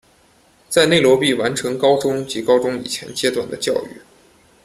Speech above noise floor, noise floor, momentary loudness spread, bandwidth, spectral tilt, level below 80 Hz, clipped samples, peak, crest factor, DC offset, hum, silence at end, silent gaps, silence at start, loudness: 37 dB; -54 dBFS; 11 LU; 15 kHz; -4 dB/octave; -56 dBFS; under 0.1%; 0 dBFS; 18 dB; under 0.1%; none; 0.65 s; none; 0.7 s; -18 LUFS